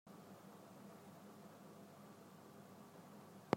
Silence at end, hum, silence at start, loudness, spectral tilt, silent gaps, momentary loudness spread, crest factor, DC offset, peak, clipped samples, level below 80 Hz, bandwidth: 0 s; none; 0.05 s; -60 LUFS; -6 dB/octave; none; 1 LU; 34 dB; under 0.1%; -18 dBFS; under 0.1%; under -90 dBFS; 16 kHz